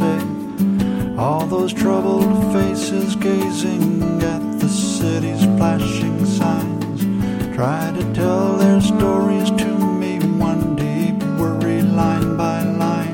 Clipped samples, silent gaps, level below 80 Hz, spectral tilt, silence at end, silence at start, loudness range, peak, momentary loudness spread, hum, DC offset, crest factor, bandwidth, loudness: under 0.1%; none; -40 dBFS; -6.5 dB/octave; 0 s; 0 s; 1 LU; -2 dBFS; 5 LU; none; under 0.1%; 14 dB; 17 kHz; -18 LUFS